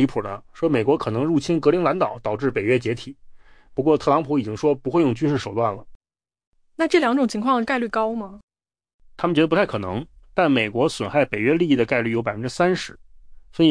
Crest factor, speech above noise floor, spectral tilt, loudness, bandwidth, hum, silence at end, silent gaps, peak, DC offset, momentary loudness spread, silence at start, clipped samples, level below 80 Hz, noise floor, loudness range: 16 dB; 24 dB; -6.5 dB/octave; -21 LUFS; 10.5 kHz; none; 0 s; 5.95-6.00 s, 6.47-6.52 s, 8.43-8.48 s, 8.94-8.99 s; -6 dBFS; under 0.1%; 10 LU; 0 s; under 0.1%; -52 dBFS; -45 dBFS; 2 LU